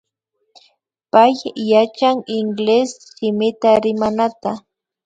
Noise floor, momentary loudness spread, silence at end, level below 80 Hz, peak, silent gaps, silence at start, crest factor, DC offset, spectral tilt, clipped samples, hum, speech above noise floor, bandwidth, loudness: -71 dBFS; 11 LU; 0.45 s; -60 dBFS; 0 dBFS; none; 1.15 s; 18 dB; under 0.1%; -5.5 dB/octave; under 0.1%; none; 55 dB; 9.2 kHz; -17 LUFS